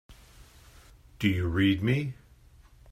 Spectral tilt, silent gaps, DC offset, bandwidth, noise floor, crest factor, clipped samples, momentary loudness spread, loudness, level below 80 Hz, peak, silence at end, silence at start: -7 dB/octave; none; under 0.1%; 15.5 kHz; -56 dBFS; 18 dB; under 0.1%; 12 LU; -28 LUFS; -52 dBFS; -12 dBFS; 0.8 s; 0.1 s